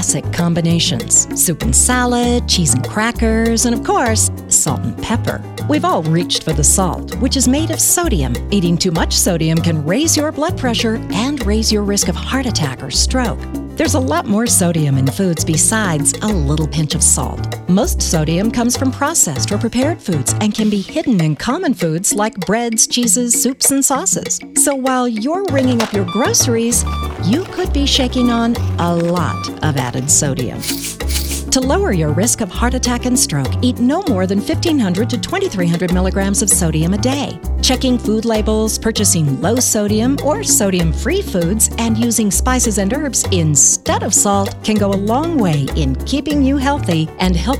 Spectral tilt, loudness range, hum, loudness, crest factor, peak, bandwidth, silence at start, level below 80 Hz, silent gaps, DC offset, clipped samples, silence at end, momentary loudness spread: -4 dB/octave; 3 LU; none; -15 LUFS; 14 dB; -2 dBFS; 17.5 kHz; 0 s; -26 dBFS; none; under 0.1%; under 0.1%; 0 s; 6 LU